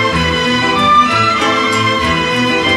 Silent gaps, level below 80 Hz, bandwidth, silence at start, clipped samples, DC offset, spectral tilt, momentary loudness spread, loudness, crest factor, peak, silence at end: none; -34 dBFS; 14 kHz; 0 s; under 0.1%; under 0.1%; -4 dB/octave; 4 LU; -11 LUFS; 12 dB; -2 dBFS; 0 s